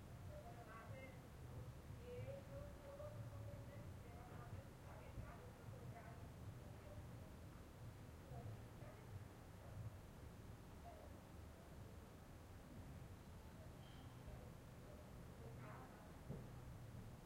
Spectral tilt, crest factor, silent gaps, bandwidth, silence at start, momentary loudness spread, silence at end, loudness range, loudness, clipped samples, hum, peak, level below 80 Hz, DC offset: -6.5 dB/octave; 16 dB; none; 16 kHz; 0 s; 5 LU; 0 s; 4 LU; -58 LUFS; under 0.1%; none; -40 dBFS; -64 dBFS; under 0.1%